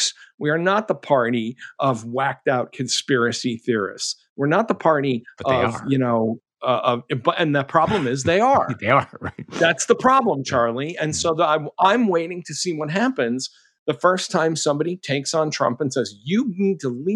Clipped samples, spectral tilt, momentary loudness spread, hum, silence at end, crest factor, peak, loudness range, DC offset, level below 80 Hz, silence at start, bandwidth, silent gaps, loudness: under 0.1%; -4.5 dB/octave; 8 LU; none; 0 s; 18 dB; -2 dBFS; 3 LU; under 0.1%; -58 dBFS; 0 s; 12 kHz; 0.34-0.38 s, 4.29-4.36 s, 13.79-13.86 s; -21 LUFS